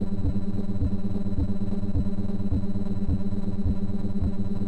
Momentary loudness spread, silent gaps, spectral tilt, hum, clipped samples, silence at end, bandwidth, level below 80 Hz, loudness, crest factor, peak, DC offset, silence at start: 2 LU; none; -10 dB/octave; none; under 0.1%; 0 s; 4.3 kHz; -32 dBFS; -29 LUFS; 8 dB; -14 dBFS; under 0.1%; 0 s